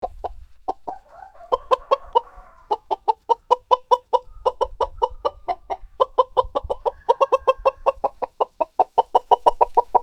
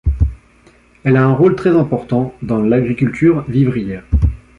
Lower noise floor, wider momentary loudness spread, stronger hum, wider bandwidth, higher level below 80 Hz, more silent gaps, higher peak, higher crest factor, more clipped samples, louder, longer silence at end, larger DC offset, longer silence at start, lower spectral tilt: about the same, -45 dBFS vs -48 dBFS; first, 13 LU vs 7 LU; neither; first, 9.2 kHz vs 7.8 kHz; second, -44 dBFS vs -24 dBFS; neither; about the same, 0 dBFS vs -2 dBFS; first, 22 dB vs 12 dB; neither; second, -22 LUFS vs -15 LUFS; second, 0 s vs 0.2 s; neither; about the same, 0 s vs 0.05 s; second, -4.5 dB/octave vs -10 dB/octave